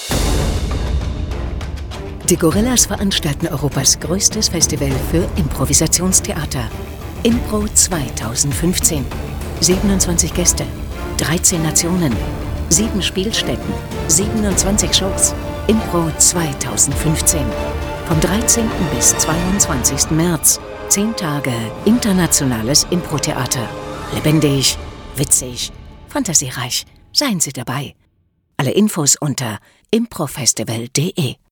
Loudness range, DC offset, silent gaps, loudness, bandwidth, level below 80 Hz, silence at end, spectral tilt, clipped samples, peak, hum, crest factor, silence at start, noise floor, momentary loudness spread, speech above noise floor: 3 LU; under 0.1%; none; -16 LUFS; over 20 kHz; -28 dBFS; 0.15 s; -3.5 dB/octave; under 0.1%; 0 dBFS; none; 16 dB; 0 s; -61 dBFS; 11 LU; 45 dB